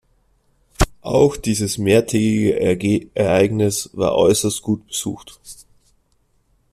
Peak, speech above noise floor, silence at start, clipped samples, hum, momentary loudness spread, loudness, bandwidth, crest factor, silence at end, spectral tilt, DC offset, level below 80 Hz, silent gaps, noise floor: 0 dBFS; 44 dB; 0.8 s; under 0.1%; none; 10 LU; -18 LUFS; 14.5 kHz; 18 dB; 1.2 s; -5 dB/octave; under 0.1%; -36 dBFS; none; -62 dBFS